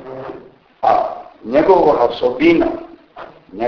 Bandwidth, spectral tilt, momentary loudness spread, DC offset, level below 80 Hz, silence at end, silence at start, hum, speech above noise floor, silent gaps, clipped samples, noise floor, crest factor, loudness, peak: 5.4 kHz; -7.5 dB/octave; 19 LU; under 0.1%; -46 dBFS; 0 s; 0 s; none; 27 dB; none; under 0.1%; -40 dBFS; 16 dB; -15 LUFS; 0 dBFS